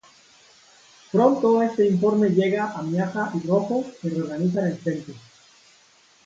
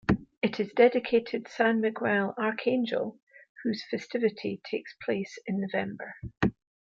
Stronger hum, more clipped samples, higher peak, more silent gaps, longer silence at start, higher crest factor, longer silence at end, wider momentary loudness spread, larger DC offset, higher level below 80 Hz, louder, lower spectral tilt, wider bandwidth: neither; neither; about the same, -6 dBFS vs -8 dBFS; second, none vs 0.38-0.42 s, 3.22-3.27 s, 3.49-3.55 s; first, 1.15 s vs 0.1 s; about the same, 18 dB vs 20 dB; first, 1.05 s vs 0.35 s; second, 9 LU vs 12 LU; neither; second, -66 dBFS vs -54 dBFS; first, -22 LUFS vs -29 LUFS; about the same, -8 dB/octave vs -7 dB/octave; about the same, 7.8 kHz vs 7.4 kHz